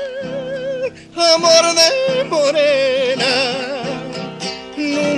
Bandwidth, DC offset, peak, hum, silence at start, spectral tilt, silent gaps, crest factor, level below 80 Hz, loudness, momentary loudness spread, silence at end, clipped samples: 15 kHz; under 0.1%; 0 dBFS; none; 0 s; -2.5 dB/octave; none; 16 dB; -56 dBFS; -15 LUFS; 15 LU; 0 s; under 0.1%